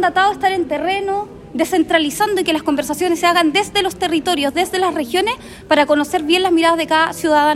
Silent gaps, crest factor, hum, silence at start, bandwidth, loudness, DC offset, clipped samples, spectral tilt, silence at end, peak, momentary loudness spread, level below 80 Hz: none; 14 dB; none; 0 s; 16 kHz; -16 LUFS; under 0.1%; under 0.1%; -3 dB/octave; 0 s; -2 dBFS; 6 LU; -48 dBFS